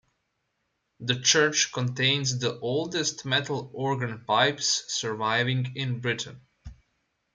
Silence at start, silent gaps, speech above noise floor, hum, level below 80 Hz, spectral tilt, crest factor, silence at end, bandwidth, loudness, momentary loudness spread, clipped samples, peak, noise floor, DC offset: 1 s; none; 50 dB; none; -62 dBFS; -3 dB/octave; 22 dB; 0.6 s; 9.6 kHz; -26 LUFS; 9 LU; under 0.1%; -6 dBFS; -77 dBFS; under 0.1%